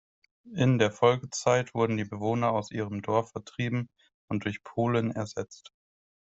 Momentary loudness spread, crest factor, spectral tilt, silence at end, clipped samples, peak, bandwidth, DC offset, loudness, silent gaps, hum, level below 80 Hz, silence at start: 12 LU; 22 dB; -6 dB/octave; 0.7 s; under 0.1%; -8 dBFS; 8.2 kHz; under 0.1%; -29 LUFS; 4.14-4.28 s; none; -64 dBFS; 0.45 s